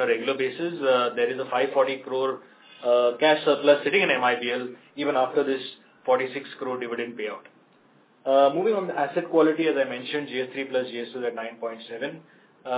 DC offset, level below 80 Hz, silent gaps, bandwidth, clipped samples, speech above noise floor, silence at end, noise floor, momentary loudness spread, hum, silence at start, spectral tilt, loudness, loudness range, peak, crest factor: under 0.1%; -84 dBFS; none; 4 kHz; under 0.1%; 34 dB; 0 s; -59 dBFS; 14 LU; none; 0 s; -8.5 dB/octave; -25 LUFS; 6 LU; -6 dBFS; 18 dB